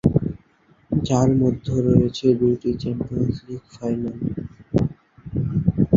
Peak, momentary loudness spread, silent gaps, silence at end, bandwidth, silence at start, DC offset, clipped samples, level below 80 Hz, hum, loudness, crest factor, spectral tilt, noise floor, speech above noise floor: -2 dBFS; 13 LU; none; 0 s; 7.6 kHz; 0.05 s; under 0.1%; under 0.1%; -40 dBFS; none; -22 LUFS; 20 dB; -8.5 dB/octave; -57 dBFS; 36 dB